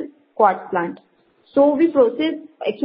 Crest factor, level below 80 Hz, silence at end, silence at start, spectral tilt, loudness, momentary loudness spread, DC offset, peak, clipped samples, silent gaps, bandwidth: 18 dB; -66 dBFS; 0 s; 0 s; -10.5 dB/octave; -19 LUFS; 12 LU; under 0.1%; 0 dBFS; under 0.1%; none; 5.4 kHz